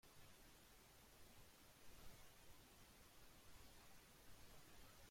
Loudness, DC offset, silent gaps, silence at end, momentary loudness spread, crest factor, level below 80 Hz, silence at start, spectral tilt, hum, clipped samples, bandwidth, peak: -67 LUFS; under 0.1%; none; 0 s; 2 LU; 16 dB; -72 dBFS; 0.05 s; -3 dB/octave; none; under 0.1%; 16.5 kHz; -48 dBFS